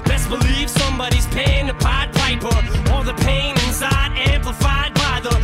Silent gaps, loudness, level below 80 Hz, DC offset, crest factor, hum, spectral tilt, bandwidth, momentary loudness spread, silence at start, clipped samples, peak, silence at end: none; -18 LUFS; -20 dBFS; under 0.1%; 10 dB; none; -4.5 dB/octave; 16 kHz; 2 LU; 0 s; under 0.1%; -8 dBFS; 0 s